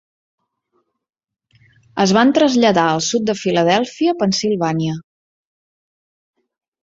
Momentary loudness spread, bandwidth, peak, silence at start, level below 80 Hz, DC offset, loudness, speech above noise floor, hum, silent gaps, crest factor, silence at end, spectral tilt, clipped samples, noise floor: 8 LU; 7.8 kHz; -2 dBFS; 1.95 s; -58 dBFS; under 0.1%; -16 LUFS; 52 dB; none; none; 18 dB; 1.8 s; -4.5 dB/octave; under 0.1%; -67 dBFS